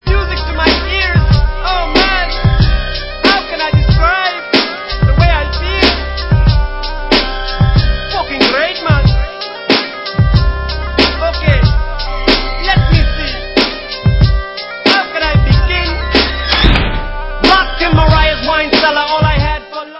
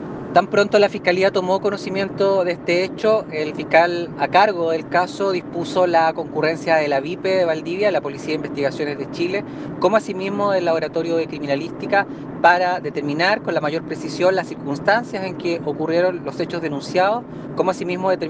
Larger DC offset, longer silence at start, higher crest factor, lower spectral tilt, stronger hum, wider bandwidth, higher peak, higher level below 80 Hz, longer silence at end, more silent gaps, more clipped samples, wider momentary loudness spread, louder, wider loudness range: neither; about the same, 0.05 s vs 0 s; second, 12 dB vs 18 dB; first, -7 dB/octave vs -5.5 dB/octave; neither; second, 8 kHz vs 9.4 kHz; about the same, 0 dBFS vs 0 dBFS; first, -16 dBFS vs -60 dBFS; about the same, 0 s vs 0 s; neither; first, 0.2% vs under 0.1%; about the same, 7 LU vs 9 LU; first, -12 LUFS vs -20 LUFS; about the same, 2 LU vs 3 LU